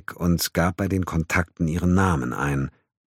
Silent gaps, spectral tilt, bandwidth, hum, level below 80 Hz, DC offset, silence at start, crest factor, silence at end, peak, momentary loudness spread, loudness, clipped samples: none; -5.5 dB/octave; 16.5 kHz; none; -40 dBFS; under 0.1%; 0.1 s; 18 dB; 0.4 s; -6 dBFS; 5 LU; -23 LUFS; under 0.1%